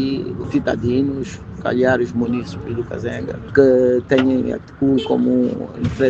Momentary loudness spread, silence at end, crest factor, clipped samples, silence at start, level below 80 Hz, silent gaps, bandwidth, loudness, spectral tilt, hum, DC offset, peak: 11 LU; 0 s; 18 dB; under 0.1%; 0 s; -42 dBFS; none; 7.6 kHz; -19 LUFS; -7.5 dB/octave; none; under 0.1%; 0 dBFS